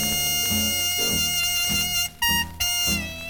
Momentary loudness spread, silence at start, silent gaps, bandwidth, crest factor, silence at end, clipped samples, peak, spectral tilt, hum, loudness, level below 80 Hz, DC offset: 2 LU; 0 s; none; 19.5 kHz; 14 dB; 0 s; under 0.1%; -10 dBFS; -1 dB/octave; none; -21 LUFS; -44 dBFS; under 0.1%